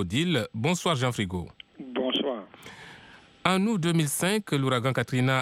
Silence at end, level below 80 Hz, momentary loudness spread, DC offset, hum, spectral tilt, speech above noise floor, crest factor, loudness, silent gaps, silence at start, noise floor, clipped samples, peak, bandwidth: 0 s; -60 dBFS; 20 LU; under 0.1%; none; -5 dB/octave; 26 dB; 20 dB; -27 LUFS; none; 0 s; -52 dBFS; under 0.1%; -6 dBFS; 16 kHz